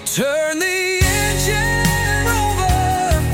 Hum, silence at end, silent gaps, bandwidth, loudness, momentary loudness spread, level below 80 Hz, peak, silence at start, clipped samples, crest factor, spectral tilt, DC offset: none; 0 s; none; 17 kHz; -17 LUFS; 2 LU; -26 dBFS; -2 dBFS; 0 s; under 0.1%; 16 dB; -4 dB/octave; under 0.1%